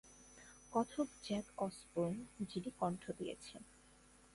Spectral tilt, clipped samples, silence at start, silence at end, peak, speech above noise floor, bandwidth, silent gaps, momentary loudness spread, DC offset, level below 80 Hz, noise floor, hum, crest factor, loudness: -6 dB/octave; under 0.1%; 0.05 s; 0.6 s; -22 dBFS; 24 dB; 11.5 kHz; none; 18 LU; under 0.1%; -70 dBFS; -66 dBFS; none; 20 dB; -43 LUFS